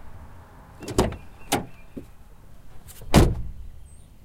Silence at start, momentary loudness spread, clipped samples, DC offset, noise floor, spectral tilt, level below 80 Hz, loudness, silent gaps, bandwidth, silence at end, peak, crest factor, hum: 0 s; 27 LU; under 0.1%; under 0.1%; -45 dBFS; -5.5 dB/octave; -34 dBFS; -24 LUFS; none; 16.5 kHz; 0.3 s; -4 dBFS; 22 dB; none